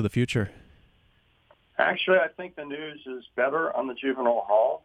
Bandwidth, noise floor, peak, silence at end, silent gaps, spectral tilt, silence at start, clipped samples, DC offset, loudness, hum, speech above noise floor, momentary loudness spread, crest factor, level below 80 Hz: 12.5 kHz; -64 dBFS; -6 dBFS; 0.05 s; none; -6 dB/octave; 0 s; under 0.1%; under 0.1%; -26 LUFS; none; 38 dB; 14 LU; 20 dB; -60 dBFS